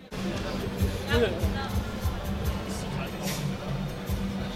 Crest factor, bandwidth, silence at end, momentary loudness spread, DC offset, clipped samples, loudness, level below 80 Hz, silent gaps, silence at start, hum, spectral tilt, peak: 18 dB; 16 kHz; 0 s; 7 LU; under 0.1%; under 0.1%; -31 LUFS; -36 dBFS; none; 0 s; none; -5.5 dB/octave; -12 dBFS